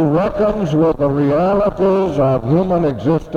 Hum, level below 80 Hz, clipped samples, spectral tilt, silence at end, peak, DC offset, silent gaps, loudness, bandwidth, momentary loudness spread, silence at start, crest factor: none; -36 dBFS; under 0.1%; -9 dB/octave; 0 s; -2 dBFS; under 0.1%; none; -15 LUFS; 8.2 kHz; 2 LU; 0 s; 12 dB